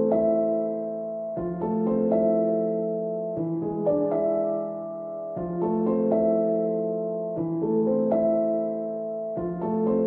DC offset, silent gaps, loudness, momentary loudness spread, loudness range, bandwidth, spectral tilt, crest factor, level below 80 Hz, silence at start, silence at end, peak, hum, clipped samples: under 0.1%; none; -26 LUFS; 9 LU; 2 LU; 2.8 kHz; -13 dB/octave; 14 dB; -58 dBFS; 0 s; 0 s; -10 dBFS; none; under 0.1%